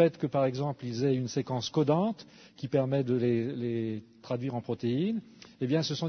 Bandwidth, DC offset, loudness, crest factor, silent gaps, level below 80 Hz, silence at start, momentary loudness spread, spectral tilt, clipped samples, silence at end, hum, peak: 6.6 kHz; under 0.1%; -31 LUFS; 20 dB; none; -70 dBFS; 0 s; 10 LU; -7 dB/octave; under 0.1%; 0 s; none; -10 dBFS